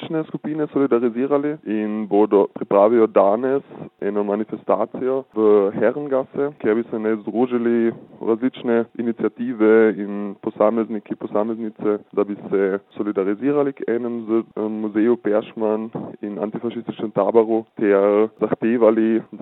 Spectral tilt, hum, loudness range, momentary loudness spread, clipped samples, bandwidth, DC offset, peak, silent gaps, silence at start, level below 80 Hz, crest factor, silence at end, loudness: -11 dB/octave; none; 4 LU; 10 LU; under 0.1%; 4 kHz; under 0.1%; -2 dBFS; none; 0 s; -74 dBFS; 18 dB; 0.05 s; -20 LUFS